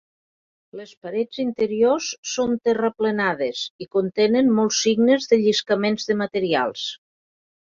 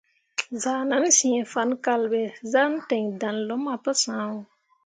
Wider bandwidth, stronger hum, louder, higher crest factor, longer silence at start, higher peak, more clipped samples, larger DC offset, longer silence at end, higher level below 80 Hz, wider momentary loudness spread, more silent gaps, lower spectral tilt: second, 7.6 kHz vs 9.6 kHz; neither; first, -21 LUFS vs -24 LUFS; about the same, 16 dB vs 20 dB; first, 0.75 s vs 0.4 s; about the same, -6 dBFS vs -6 dBFS; neither; neither; first, 0.8 s vs 0.4 s; first, -64 dBFS vs -78 dBFS; about the same, 12 LU vs 12 LU; first, 0.97-1.01 s, 2.18-2.23 s, 3.70-3.79 s vs none; first, -4 dB/octave vs -2 dB/octave